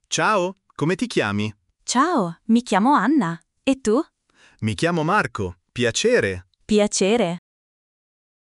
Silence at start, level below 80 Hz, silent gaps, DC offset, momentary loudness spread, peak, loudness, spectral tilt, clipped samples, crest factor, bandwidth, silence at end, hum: 0.1 s; -54 dBFS; none; under 0.1%; 11 LU; -6 dBFS; -21 LUFS; -4.5 dB/octave; under 0.1%; 16 dB; 11.5 kHz; 1.1 s; none